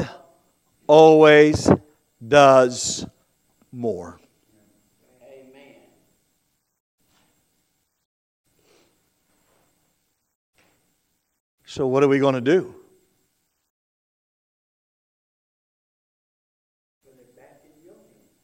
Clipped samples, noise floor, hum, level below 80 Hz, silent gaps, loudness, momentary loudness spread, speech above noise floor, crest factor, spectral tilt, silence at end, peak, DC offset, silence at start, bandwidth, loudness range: under 0.1%; -71 dBFS; none; -56 dBFS; 6.80-6.98 s, 8.05-8.44 s, 10.35-10.53 s, 11.40-11.58 s; -16 LUFS; 24 LU; 56 dB; 22 dB; -5 dB/octave; 5.75 s; 0 dBFS; under 0.1%; 0 s; 11.5 kHz; 21 LU